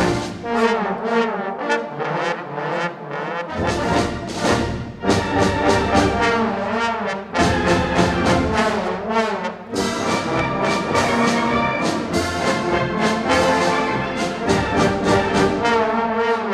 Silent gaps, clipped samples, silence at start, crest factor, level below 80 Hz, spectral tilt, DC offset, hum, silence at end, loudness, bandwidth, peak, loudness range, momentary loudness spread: none; under 0.1%; 0 s; 18 dB; -38 dBFS; -5 dB/octave; under 0.1%; none; 0 s; -20 LUFS; 14.5 kHz; -2 dBFS; 4 LU; 7 LU